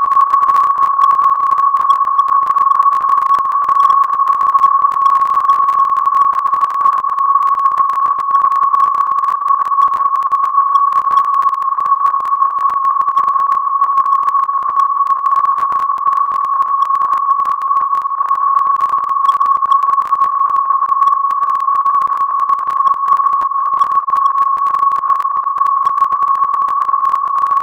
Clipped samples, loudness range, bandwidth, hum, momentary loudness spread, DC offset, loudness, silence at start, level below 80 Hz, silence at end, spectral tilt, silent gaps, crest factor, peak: under 0.1%; 2 LU; 8.2 kHz; none; 4 LU; under 0.1%; -12 LUFS; 0 s; -60 dBFS; 0 s; -2.5 dB/octave; none; 12 dB; 0 dBFS